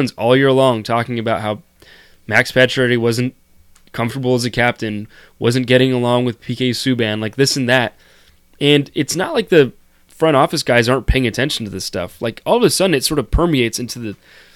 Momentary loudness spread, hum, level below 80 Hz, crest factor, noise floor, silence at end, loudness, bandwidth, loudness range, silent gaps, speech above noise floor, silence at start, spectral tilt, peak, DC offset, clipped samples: 10 LU; none; -34 dBFS; 16 dB; -49 dBFS; 0.4 s; -16 LUFS; 16.5 kHz; 2 LU; none; 33 dB; 0 s; -5 dB/octave; 0 dBFS; under 0.1%; under 0.1%